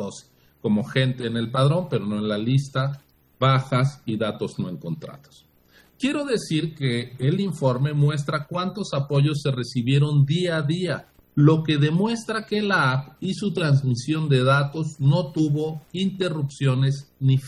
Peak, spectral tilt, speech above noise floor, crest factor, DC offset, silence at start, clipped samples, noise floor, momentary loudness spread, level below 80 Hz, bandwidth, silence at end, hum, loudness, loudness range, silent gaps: -4 dBFS; -7 dB/octave; 34 dB; 18 dB; under 0.1%; 0 s; under 0.1%; -56 dBFS; 9 LU; -62 dBFS; 11 kHz; 0 s; none; -23 LUFS; 5 LU; none